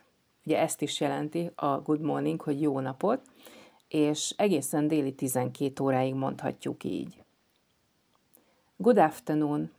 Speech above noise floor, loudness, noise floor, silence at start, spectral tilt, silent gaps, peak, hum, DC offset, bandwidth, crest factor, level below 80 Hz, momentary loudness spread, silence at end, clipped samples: 43 dB; -29 LUFS; -71 dBFS; 0.45 s; -5.5 dB/octave; none; -10 dBFS; none; under 0.1%; over 20 kHz; 20 dB; -74 dBFS; 9 LU; 0.1 s; under 0.1%